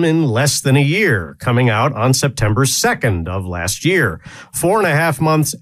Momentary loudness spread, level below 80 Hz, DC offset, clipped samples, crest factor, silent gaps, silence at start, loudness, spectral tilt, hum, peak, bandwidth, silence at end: 7 LU; -40 dBFS; under 0.1%; under 0.1%; 14 dB; none; 0 s; -15 LUFS; -4.5 dB/octave; none; 0 dBFS; 15.5 kHz; 0.05 s